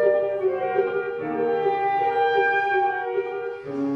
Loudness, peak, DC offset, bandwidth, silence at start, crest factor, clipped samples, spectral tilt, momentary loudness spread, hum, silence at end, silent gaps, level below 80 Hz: -23 LUFS; -8 dBFS; under 0.1%; 6.2 kHz; 0 s; 16 dB; under 0.1%; -6.5 dB/octave; 8 LU; none; 0 s; none; -66 dBFS